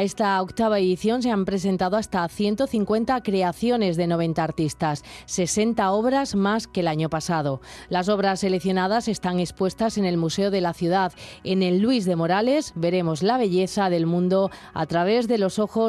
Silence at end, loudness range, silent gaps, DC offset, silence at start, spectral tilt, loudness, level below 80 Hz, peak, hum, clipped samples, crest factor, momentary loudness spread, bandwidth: 0 s; 2 LU; none; under 0.1%; 0 s; -5.5 dB/octave; -23 LUFS; -52 dBFS; -10 dBFS; none; under 0.1%; 12 dB; 5 LU; 13.5 kHz